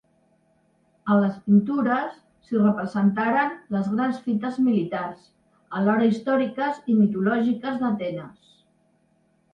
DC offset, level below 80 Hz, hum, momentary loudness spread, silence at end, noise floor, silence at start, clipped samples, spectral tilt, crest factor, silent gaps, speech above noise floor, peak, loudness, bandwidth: under 0.1%; -66 dBFS; none; 9 LU; 1.2 s; -65 dBFS; 1.05 s; under 0.1%; -8.5 dB/octave; 16 dB; none; 42 dB; -8 dBFS; -23 LUFS; 5.4 kHz